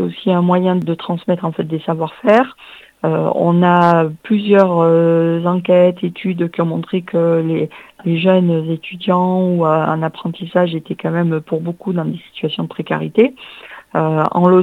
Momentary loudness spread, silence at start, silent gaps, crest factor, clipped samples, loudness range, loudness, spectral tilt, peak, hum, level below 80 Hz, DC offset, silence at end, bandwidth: 10 LU; 0 s; none; 16 dB; under 0.1%; 6 LU; -16 LUFS; -9 dB/octave; 0 dBFS; none; -64 dBFS; under 0.1%; 0 s; 4.9 kHz